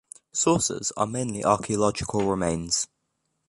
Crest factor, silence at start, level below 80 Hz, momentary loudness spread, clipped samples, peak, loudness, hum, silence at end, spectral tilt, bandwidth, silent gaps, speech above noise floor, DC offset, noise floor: 20 dB; 0.35 s; -50 dBFS; 5 LU; under 0.1%; -6 dBFS; -25 LUFS; none; 0.65 s; -4 dB/octave; 11.5 kHz; none; 51 dB; under 0.1%; -76 dBFS